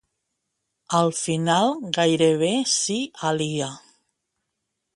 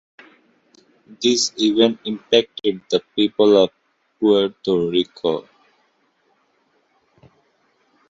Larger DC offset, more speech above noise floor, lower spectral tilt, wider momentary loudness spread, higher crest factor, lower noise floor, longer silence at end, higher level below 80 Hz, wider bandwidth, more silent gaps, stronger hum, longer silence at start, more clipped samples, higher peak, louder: neither; first, 58 dB vs 46 dB; about the same, -4 dB/octave vs -4 dB/octave; about the same, 7 LU vs 9 LU; about the same, 20 dB vs 20 dB; first, -79 dBFS vs -64 dBFS; second, 1.15 s vs 2.7 s; about the same, -66 dBFS vs -62 dBFS; first, 11.5 kHz vs 8 kHz; neither; neither; second, 0.9 s vs 1.1 s; neither; second, -6 dBFS vs -2 dBFS; second, -22 LUFS vs -19 LUFS